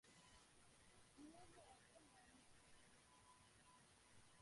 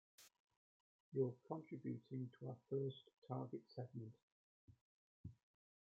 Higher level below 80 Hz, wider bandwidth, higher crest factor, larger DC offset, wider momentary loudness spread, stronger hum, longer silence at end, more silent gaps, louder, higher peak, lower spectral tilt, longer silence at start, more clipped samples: about the same, -84 dBFS vs -84 dBFS; first, 11.5 kHz vs 7.2 kHz; second, 16 dB vs 22 dB; neither; second, 5 LU vs 17 LU; neither; second, 0 s vs 0.6 s; second, none vs 0.40-0.47 s, 0.57-1.12 s, 3.18-3.22 s, 4.23-4.68 s, 4.81-5.24 s; second, -68 LUFS vs -49 LUFS; second, -52 dBFS vs -30 dBFS; second, -3 dB/octave vs -8.5 dB/octave; second, 0.05 s vs 0.2 s; neither